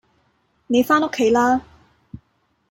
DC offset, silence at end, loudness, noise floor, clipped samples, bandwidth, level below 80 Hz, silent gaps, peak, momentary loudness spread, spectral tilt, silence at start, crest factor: under 0.1%; 1.1 s; -18 LUFS; -66 dBFS; under 0.1%; 16.5 kHz; -54 dBFS; none; -4 dBFS; 5 LU; -4.5 dB/octave; 0.7 s; 18 dB